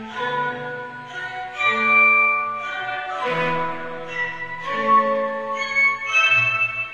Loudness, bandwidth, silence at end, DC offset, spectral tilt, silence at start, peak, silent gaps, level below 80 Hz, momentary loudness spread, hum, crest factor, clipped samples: -19 LUFS; 9.2 kHz; 0 s; under 0.1%; -3.5 dB/octave; 0 s; -6 dBFS; none; -62 dBFS; 16 LU; none; 16 dB; under 0.1%